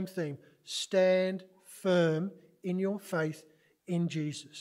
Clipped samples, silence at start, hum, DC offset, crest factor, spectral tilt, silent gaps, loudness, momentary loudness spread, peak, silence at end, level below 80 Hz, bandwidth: under 0.1%; 0 s; none; under 0.1%; 16 dB; -5.5 dB/octave; none; -32 LUFS; 15 LU; -16 dBFS; 0 s; -80 dBFS; 16 kHz